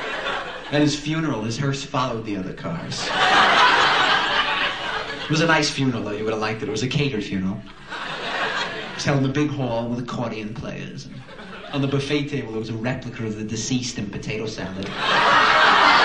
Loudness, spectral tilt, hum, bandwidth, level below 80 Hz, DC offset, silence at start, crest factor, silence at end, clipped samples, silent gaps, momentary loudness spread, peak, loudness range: -21 LUFS; -4 dB/octave; none; 10.5 kHz; -48 dBFS; 0.5%; 0 s; 20 dB; 0 s; under 0.1%; none; 15 LU; -2 dBFS; 9 LU